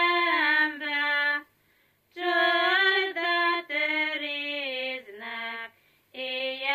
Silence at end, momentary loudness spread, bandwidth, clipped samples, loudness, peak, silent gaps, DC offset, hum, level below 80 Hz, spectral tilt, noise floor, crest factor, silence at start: 0 s; 14 LU; 15 kHz; under 0.1%; -25 LUFS; -10 dBFS; none; under 0.1%; 50 Hz at -80 dBFS; -84 dBFS; -2 dB/octave; -67 dBFS; 18 dB; 0 s